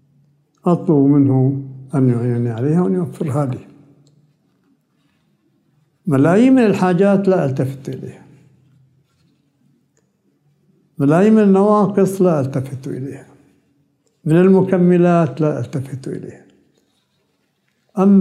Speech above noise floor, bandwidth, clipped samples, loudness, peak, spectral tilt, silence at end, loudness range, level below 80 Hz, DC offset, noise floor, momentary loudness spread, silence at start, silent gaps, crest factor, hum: 51 dB; 12.5 kHz; under 0.1%; -15 LUFS; -2 dBFS; -9 dB/octave; 0 s; 7 LU; -64 dBFS; under 0.1%; -65 dBFS; 17 LU; 0.65 s; none; 16 dB; none